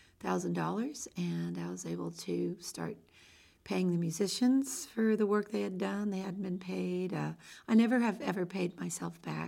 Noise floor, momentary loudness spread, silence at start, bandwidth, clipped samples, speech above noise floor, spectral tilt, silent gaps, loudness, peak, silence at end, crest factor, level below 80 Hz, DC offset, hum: -61 dBFS; 11 LU; 0.2 s; 16.5 kHz; under 0.1%; 28 dB; -5.5 dB/octave; none; -34 LUFS; -16 dBFS; 0 s; 18 dB; -74 dBFS; under 0.1%; none